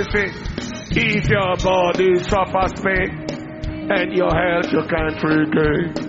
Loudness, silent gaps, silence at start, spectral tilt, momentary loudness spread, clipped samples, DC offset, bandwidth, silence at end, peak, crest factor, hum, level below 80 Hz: -19 LUFS; none; 0 s; -4.5 dB/octave; 12 LU; under 0.1%; under 0.1%; 7.8 kHz; 0 s; -4 dBFS; 16 dB; none; -34 dBFS